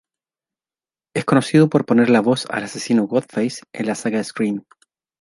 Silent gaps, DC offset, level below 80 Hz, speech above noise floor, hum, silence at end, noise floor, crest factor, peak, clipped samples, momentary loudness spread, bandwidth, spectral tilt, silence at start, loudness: none; under 0.1%; -64 dBFS; over 72 dB; none; 0.6 s; under -90 dBFS; 18 dB; -2 dBFS; under 0.1%; 11 LU; 11.5 kHz; -6 dB/octave; 1.15 s; -19 LUFS